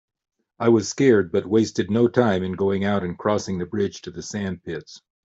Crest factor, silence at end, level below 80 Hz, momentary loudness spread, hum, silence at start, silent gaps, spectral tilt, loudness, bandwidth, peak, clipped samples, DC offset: 18 dB; 0.25 s; -60 dBFS; 12 LU; none; 0.6 s; none; -6 dB/octave; -22 LUFS; 8 kHz; -4 dBFS; under 0.1%; under 0.1%